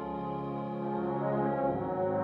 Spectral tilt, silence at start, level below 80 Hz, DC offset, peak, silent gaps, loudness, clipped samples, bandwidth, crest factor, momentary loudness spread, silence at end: -10.5 dB/octave; 0 s; -60 dBFS; under 0.1%; -18 dBFS; none; -33 LUFS; under 0.1%; 5.2 kHz; 14 dB; 6 LU; 0 s